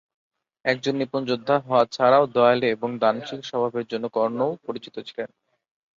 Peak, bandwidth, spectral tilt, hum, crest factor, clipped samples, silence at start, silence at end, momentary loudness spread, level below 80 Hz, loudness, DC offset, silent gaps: -4 dBFS; 7.6 kHz; -6 dB/octave; none; 18 dB; under 0.1%; 0.65 s; 0.7 s; 15 LU; -68 dBFS; -23 LUFS; under 0.1%; none